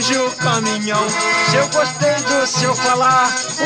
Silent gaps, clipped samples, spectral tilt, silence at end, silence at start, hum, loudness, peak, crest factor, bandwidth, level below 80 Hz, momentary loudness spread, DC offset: none; under 0.1%; -3 dB/octave; 0 s; 0 s; none; -15 LUFS; -2 dBFS; 14 dB; 11.5 kHz; -60 dBFS; 4 LU; under 0.1%